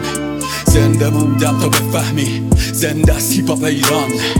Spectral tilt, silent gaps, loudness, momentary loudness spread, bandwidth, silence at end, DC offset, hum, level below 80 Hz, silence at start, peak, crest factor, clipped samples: -5 dB/octave; none; -14 LUFS; 5 LU; 18 kHz; 0 s; under 0.1%; none; -24 dBFS; 0 s; 0 dBFS; 14 dB; under 0.1%